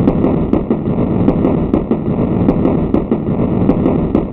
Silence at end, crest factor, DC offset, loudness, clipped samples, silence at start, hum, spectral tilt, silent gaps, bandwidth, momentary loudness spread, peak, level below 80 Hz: 0 s; 14 dB; under 0.1%; -14 LUFS; under 0.1%; 0 s; none; -12 dB/octave; none; 4.2 kHz; 3 LU; 0 dBFS; -26 dBFS